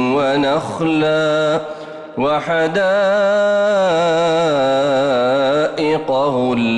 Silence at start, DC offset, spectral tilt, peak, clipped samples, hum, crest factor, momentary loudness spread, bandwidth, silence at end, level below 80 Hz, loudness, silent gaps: 0 s; under 0.1%; -5.5 dB/octave; -8 dBFS; under 0.1%; none; 8 dB; 4 LU; 10.5 kHz; 0 s; -54 dBFS; -16 LUFS; none